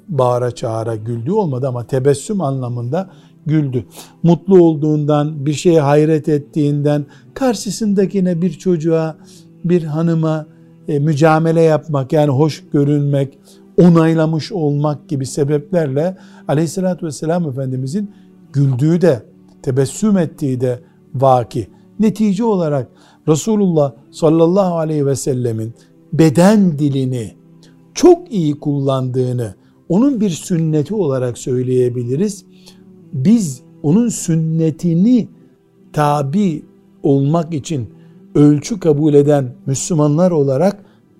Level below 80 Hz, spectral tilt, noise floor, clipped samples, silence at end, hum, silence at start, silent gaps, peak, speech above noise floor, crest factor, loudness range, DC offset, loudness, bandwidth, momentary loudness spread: -50 dBFS; -7.5 dB/octave; -48 dBFS; under 0.1%; 0.45 s; none; 0.1 s; none; 0 dBFS; 33 dB; 16 dB; 4 LU; under 0.1%; -15 LUFS; 13.5 kHz; 12 LU